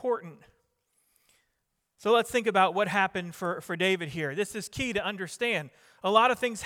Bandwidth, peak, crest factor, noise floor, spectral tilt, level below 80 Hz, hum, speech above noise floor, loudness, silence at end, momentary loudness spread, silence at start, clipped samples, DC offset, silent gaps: 17 kHz; -8 dBFS; 22 dB; -79 dBFS; -4 dB/octave; -64 dBFS; none; 51 dB; -28 LUFS; 0 s; 10 LU; 0 s; under 0.1%; under 0.1%; none